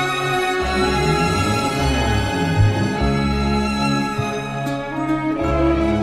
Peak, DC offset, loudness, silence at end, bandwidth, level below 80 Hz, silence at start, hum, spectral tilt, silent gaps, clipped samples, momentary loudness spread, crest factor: -4 dBFS; under 0.1%; -19 LUFS; 0 s; 15 kHz; -28 dBFS; 0 s; none; -5.5 dB/octave; none; under 0.1%; 6 LU; 14 dB